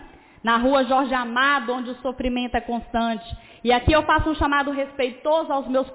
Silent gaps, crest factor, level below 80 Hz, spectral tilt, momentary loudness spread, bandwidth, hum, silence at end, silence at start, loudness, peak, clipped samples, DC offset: none; 14 dB; -38 dBFS; -9 dB/octave; 9 LU; 4 kHz; none; 0 s; 0 s; -22 LUFS; -8 dBFS; under 0.1%; under 0.1%